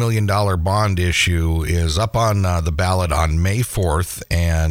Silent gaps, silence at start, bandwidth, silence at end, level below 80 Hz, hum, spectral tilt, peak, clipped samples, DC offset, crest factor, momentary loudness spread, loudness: none; 0 s; 16 kHz; 0 s; -26 dBFS; none; -5 dB/octave; -4 dBFS; under 0.1%; under 0.1%; 12 dB; 3 LU; -18 LUFS